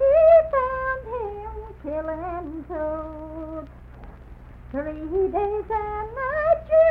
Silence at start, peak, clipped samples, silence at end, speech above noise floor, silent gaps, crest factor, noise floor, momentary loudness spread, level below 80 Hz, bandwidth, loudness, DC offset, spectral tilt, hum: 0 s; -6 dBFS; under 0.1%; 0 s; 17 dB; none; 16 dB; -43 dBFS; 19 LU; -42 dBFS; 4.1 kHz; -23 LUFS; under 0.1%; -9.5 dB/octave; 60 Hz at -60 dBFS